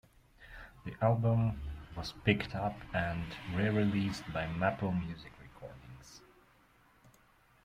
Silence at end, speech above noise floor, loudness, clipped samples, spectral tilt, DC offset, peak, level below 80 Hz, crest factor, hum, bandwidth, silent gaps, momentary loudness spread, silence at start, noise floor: 1.45 s; 33 dB; -34 LUFS; under 0.1%; -7 dB/octave; under 0.1%; -14 dBFS; -54 dBFS; 20 dB; none; 12 kHz; none; 22 LU; 0.4 s; -66 dBFS